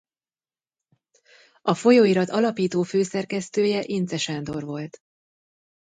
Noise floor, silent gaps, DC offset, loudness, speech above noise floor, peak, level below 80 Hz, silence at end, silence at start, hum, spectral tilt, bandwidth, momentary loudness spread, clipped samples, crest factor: under -90 dBFS; none; under 0.1%; -23 LUFS; over 68 dB; -6 dBFS; -66 dBFS; 1.05 s; 1.65 s; none; -5.5 dB/octave; 9.4 kHz; 14 LU; under 0.1%; 20 dB